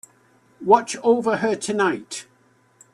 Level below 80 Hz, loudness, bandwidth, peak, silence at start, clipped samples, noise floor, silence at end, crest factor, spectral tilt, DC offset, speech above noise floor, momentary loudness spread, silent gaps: -68 dBFS; -21 LUFS; 12.5 kHz; -2 dBFS; 0.6 s; under 0.1%; -58 dBFS; 0.7 s; 20 dB; -4 dB/octave; under 0.1%; 38 dB; 14 LU; none